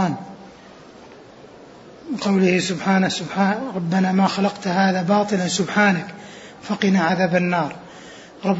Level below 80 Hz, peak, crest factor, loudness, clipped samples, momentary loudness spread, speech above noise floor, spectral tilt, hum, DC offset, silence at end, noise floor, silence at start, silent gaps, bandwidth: -62 dBFS; -4 dBFS; 18 dB; -20 LUFS; under 0.1%; 21 LU; 24 dB; -5.5 dB/octave; none; under 0.1%; 0 s; -43 dBFS; 0 s; none; 8 kHz